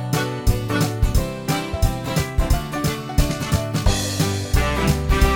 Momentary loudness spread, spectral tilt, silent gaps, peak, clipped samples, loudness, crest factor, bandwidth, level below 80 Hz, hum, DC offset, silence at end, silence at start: 4 LU; -5 dB/octave; none; -4 dBFS; under 0.1%; -22 LUFS; 16 dB; 17.5 kHz; -24 dBFS; none; under 0.1%; 0 s; 0 s